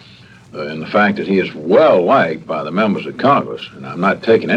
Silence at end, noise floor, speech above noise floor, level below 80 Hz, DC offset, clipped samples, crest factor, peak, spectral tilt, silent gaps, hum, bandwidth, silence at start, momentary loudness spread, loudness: 0 s; -42 dBFS; 27 dB; -58 dBFS; under 0.1%; under 0.1%; 16 dB; 0 dBFS; -7.5 dB/octave; none; none; 8.6 kHz; 0.55 s; 16 LU; -15 LUFS